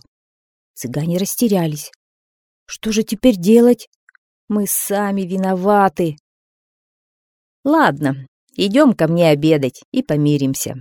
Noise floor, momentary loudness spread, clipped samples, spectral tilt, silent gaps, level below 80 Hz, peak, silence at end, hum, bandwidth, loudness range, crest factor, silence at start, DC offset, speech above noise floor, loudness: under -90 dBFS; 12 LU; under 0.1%; -5.5 dB/octave; 1.96-2.66 s, 3.87-4.07 s, 4.18-4.48 s, 6.20-7.63 s, 8.28-8.47 s, 9.85-9.92 s; -52 dBFS; 0 dBFS; 0 s; none; 18 kHz; 4 LU; 18 dB; 0.75 s; under 0.1%; over 74 dB; -16 LUFS